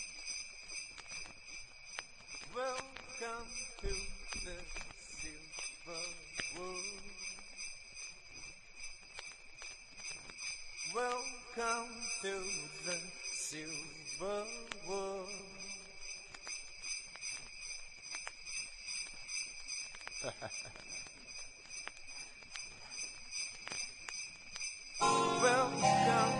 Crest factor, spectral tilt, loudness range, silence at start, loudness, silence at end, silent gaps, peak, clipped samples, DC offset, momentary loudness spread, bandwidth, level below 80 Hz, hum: 24 dB; -2 dB/octave; 6 LU; 0 s; -41 LUFS; 0 s; none; -18 dBFS; under 0.1%; under 0.1%; 11 LU; 11.5 kHz; -58 dBFS; none